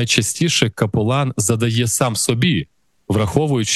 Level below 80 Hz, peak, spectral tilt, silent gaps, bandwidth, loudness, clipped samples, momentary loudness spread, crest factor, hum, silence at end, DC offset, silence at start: -46 dBFS; 0 dBFS; -4 dB/octave; none; 12.5 kHz; -17 LUFS; under 0.1%; 4 LU; 18 dB; none; 0 s; under 0.1%; 0 s